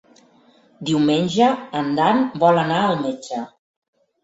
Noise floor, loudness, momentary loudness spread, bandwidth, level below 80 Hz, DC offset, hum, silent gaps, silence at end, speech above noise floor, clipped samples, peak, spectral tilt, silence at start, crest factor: -54 dBFS; -19 LUFS; 13 LU; 8 kHz; -62 dBFS; under 0.1%; none; none; 0.75 s; 36 dB; under 0.1%; -2 dBFS; -6 dB/octave; 0.8 s; 18 dB